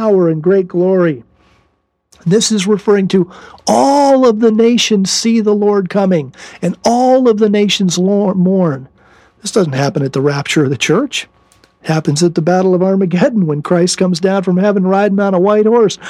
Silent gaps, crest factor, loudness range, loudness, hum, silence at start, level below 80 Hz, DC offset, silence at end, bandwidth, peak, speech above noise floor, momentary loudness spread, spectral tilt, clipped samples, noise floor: none; 12 dB; 3 LU; -12 LUFS; none; 0 s; -56 dBFS; under 0.1%; 0 s; 13 kHz; 0 dBFS; 49 dB; 7 LU; -5.5 dB/octave; under 0.1%; -61 dBFS